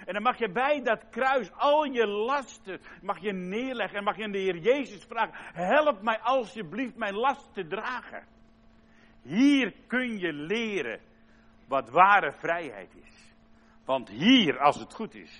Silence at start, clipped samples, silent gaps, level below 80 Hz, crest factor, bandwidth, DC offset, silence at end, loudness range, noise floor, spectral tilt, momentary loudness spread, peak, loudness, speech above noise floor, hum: 0 s; under 0.1%; none; -64 dBFS; 22 dB; 10 kHz; under 0.1%; 0 s; 5 LU; -57 dBFS; -5 dB/octave; 15 LU; -6 dBFS; -27 LUFS; 30 dB; none